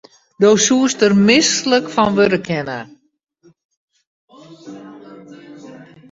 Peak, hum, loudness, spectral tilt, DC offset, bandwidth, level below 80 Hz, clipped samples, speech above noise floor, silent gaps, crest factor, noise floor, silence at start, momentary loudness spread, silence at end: 0 dBFS; none; -14 LUFS; -3.5 dB/octave; under 0.1%; 8 kHz; -56 dBFS; under 0.1%; 25 dB; 3.65-3.69 s, 3.77-3.88 s, 4.07-4.28 s; 18 dB; -39 dBFS; 0.4 s; 24 LU; 0.3 s